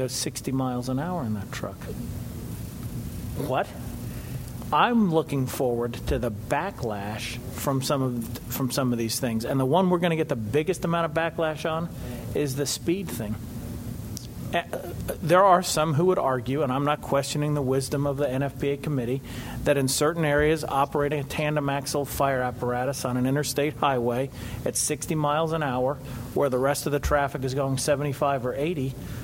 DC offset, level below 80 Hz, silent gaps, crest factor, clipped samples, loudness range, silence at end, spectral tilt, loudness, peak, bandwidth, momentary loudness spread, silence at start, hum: under 0.1%; -44 dBFS; none; 20 dB; under 0.1%; 6 LU; 0 s; -5 dB/octave; -26 LUFS; -6 dBFS; 16 kHz; 12 LU; 0 s; none